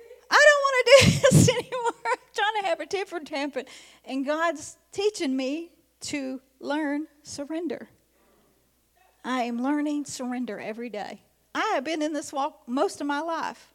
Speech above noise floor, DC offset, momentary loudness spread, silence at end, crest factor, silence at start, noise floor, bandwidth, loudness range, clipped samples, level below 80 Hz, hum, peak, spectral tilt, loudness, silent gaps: 38 dB; under 0.1%; 20 LU; 0.2 s; 22 dB; 0 s; -66 dBFS; 16 kHz; 12 LU; under 0.1%; -56 dBFS; none; -4 dBFS; -4.5 dB/octave; -25 LUFS; none